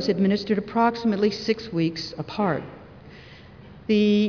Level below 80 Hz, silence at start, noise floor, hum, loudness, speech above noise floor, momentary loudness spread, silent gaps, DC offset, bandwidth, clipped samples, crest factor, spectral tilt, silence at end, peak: -56 dBFS; 0 s; -45 dBFS; none; -24 LUFS; 23 dB; 23 LU; none; under 0.1%; 5.4 kHz; under 0.1%; 16 dB; -7 dB/octave; 0 s; -8 dBFS